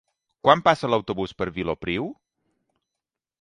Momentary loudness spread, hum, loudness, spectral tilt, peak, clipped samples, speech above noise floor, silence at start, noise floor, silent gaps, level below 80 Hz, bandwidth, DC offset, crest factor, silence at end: 11 LU; none; -23 LUFS; -6 dB/octave; 0 dBFS; under 0.1%; 64 dB; 0.45 s; -87 dBFS; none; -52 dBFS; 11 kHz; under 0.1%; 24 dB; 1.3 s